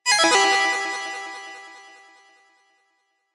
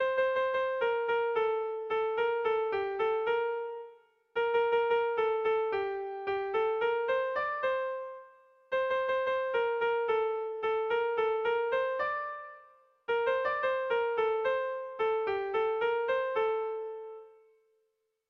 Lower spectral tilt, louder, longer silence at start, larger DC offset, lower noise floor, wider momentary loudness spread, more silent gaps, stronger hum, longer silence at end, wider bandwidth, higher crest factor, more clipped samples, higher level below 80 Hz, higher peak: second, 1 dB/octave vs -4.5 dB/octave; first, -19 LUFS vs -31 LUFS; about the same, 0.05 s vs 0 s; neither; second, -70 dBFS vs -78 dBFS; first, 23 LU vs 8 LU; neither; neither; first, 1.55 s vs 1 s; first, 11.5 kHz vs 5.6 kHz; first, 18 dB vs 12 dB; neither; about the same, -72 dBFS vs -70 dBFS; first, -6 dBFS vs -18 dBFS